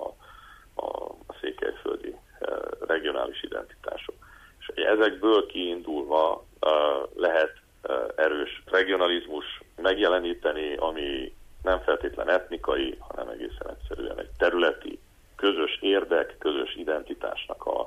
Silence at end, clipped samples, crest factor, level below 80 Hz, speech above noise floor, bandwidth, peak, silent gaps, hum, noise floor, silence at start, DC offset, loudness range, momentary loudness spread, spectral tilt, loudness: 0 s; under 0.1%; 18 dB; -50 dBFS; 24 dB; 14.5 kHz; -10 dBFS; none; none; -50 dBFS; 0 s; under 0.1%; 7 LU; 14 LU; -5 dB/octave; -27 LUFS